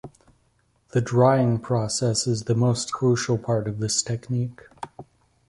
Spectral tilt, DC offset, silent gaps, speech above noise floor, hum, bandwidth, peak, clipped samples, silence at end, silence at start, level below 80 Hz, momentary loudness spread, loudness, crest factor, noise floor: -5.5 dB/octave; under 0.1%; none; 43 dB; none; 11.5 kHz; -4 dBFS; under 0.1%; 0.45 s; 0.05 s; -56 dBFS; 13 LU; -23 LUFS; 20 dB; -65 dBFS